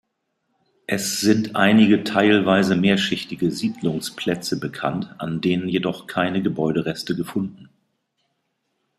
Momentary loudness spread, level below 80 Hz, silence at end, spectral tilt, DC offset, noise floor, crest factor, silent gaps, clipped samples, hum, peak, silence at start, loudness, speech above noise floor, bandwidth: 10 LU; -60 dBFS; 1.35 s; -5 dB/octave; under 0.1%; -74 dBFS; 20 dB; none; under 0.1%; none; -2 dBFS; 0.9 s; -21 LUFS; 53 dB; 14.5 kHz